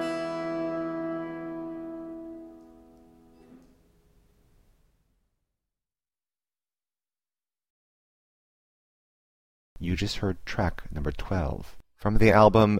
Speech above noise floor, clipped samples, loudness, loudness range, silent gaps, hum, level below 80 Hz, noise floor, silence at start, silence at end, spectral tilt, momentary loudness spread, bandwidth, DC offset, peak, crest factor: over 67 dB; under 0.1%; -27 LUFS; 19 LU; 7.70-9.76 s; none; -42 dBFS; under -90 dBFS; 0 s; 0 s; -7 dB/octave; 21 LU; 15 kHz; under 0.1%; -6 dBFS; 24 dB